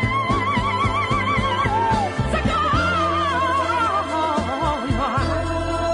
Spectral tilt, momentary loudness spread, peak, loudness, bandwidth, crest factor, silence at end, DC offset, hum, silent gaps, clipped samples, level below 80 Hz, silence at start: -5.5 dB/octave; 3 LU; -6 dBFS; -20 LUFS; 11 kHz; 14 dB; 0 s; under 0.1%; none; none; under 0.1%; -34 dBFS; 0 s